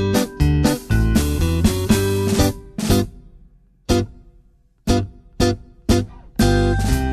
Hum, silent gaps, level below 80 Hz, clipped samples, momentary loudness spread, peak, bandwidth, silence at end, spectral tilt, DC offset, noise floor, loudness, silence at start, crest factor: none; none; -26 dBFS; under 0.1%; 10 LU; -4 dBFS; 14 kHz; 0 s; -5.5 dB/octave; under 0.1%; -53 dBFS; -19 LUFS; 0 s; 16 dB